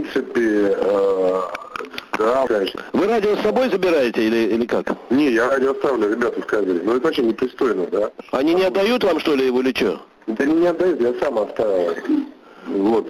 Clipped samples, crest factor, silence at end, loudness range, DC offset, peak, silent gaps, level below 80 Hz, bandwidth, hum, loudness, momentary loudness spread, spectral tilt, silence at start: under 0.1%; 12 dB; 0 s; 1 LU; under 0.1%; -6 dBFS; none; -56 dBFS; 15 kHz; none; -19 LUFS; 6 LU; -5.5 dB/octave; 0 s